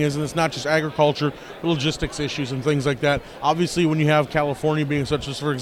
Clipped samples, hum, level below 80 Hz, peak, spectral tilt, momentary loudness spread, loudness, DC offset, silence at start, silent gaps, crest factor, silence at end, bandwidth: under 0.1%; none; -44 dBFS; -4 dBFS; -5.5 dB/octave; 7 LU; -22 LUFS; under 0.1%; 0 s; none; 18 dB; 0 s; 14 kHz